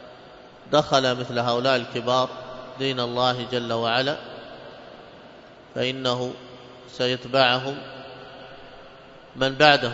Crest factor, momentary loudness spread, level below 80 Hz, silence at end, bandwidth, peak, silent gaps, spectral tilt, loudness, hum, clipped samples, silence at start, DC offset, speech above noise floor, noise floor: 24 dB; 24 LU; -60 dBFS; 0 s; 7.8 kHz; 0 dBFS; none; -4.5 dB/octave; -23 LUFS; none; under 0.1%; 0 s; under 0.1%; 24 dB; -46 dBFS